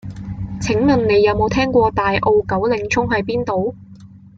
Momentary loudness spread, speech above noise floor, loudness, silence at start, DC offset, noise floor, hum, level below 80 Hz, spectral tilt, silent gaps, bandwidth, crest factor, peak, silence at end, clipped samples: 11 LU; 24 dB; -17 LUFS; 0.05 s; under 0.1%; -41 dBFS; none; -38 dBFS; -6 dB/octave; none; 7.8 kHz; 14 dB; -2 dBFS; 0.2 s; under 0.1%